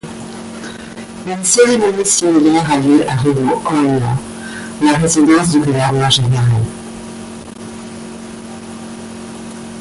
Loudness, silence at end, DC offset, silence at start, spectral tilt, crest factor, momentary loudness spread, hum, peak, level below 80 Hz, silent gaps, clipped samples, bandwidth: -13 LUFS; 0 s; under 0.1%; 0.05 s; -4.5 dB/octave; 14 dB; 19 LU; none; 0 dBFS; -44 dBFS; none; under 0.1%; 11.5 kHz